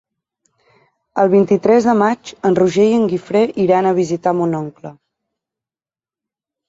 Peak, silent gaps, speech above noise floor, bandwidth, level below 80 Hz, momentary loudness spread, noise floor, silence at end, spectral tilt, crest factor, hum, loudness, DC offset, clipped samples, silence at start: -2 dBFS; none; over 76 dB; 7.8 kHz; -58 dBFS; 12 LU; under -90 dBFS; 1.75 s; -7 dB/octave; 16 dB; none; -15 LUFS; under 0.1%; under 0.1%; 1.15 s